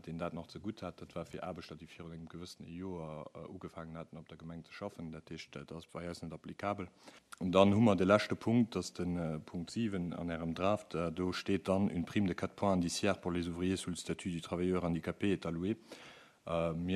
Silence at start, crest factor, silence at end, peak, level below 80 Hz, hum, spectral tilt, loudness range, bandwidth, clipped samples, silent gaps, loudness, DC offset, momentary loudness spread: 0.05 s; 24 dB; 0 s; -12 dBFS; -62 dBFS; none; -6 dB/octave; 14 LU; 13 kHz; under 0.1%; none; -36 LUFS; under 0.1%; 18 LU